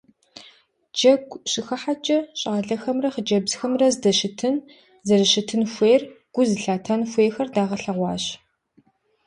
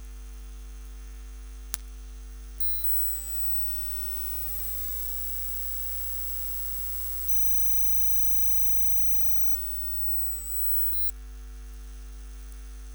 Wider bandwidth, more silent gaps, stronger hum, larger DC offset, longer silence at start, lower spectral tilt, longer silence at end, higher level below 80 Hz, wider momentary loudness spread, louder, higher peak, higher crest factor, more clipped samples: second, 11 kHz vs over 20 kHz; neither; second, none vs 50 Hz at -40 dBFS; neither; first, 0.35 s vs 0 s; first, -4 dB/octave vs -2 dB/octave; first, 0.9 s vs 0 s; second, -64 dBFS vs -40 dBFS; second, 9 LU vs 25 LU; about the same, -22 LUFS vs -23 LUFS; about the same, -4 dBFS vs -2 dBFS; second, 18 dB vs 26 dB; neither